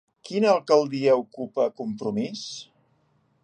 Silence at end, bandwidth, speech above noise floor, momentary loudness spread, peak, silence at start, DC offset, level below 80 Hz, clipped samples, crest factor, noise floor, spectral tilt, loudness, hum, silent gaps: 0.8 s; 9.6 kHz; 43 dB; 13 LU; -6 dBFS; 0.25 s; under 0.1%; -74 dBFS; under 0.1%; 20 dB; -66 dBFS; -5.5 dB/octave; -24 LUFS; none; none